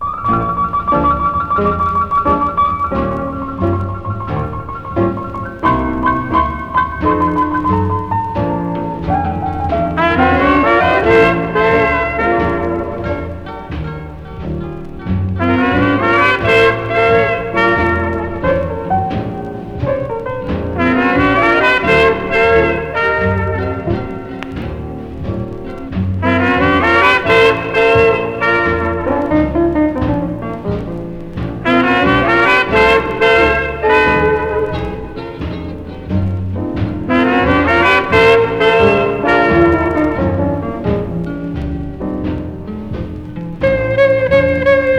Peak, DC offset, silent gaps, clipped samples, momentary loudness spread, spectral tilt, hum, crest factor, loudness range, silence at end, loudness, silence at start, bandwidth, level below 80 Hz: 0 dBFS; under 0.1%; none; under 0.1%; 14 LU; -7 dB/octave; none; 14 dB; 7 LU; 0 s; -14 LUFS; 0 s; 11 kHz; -30 dBFS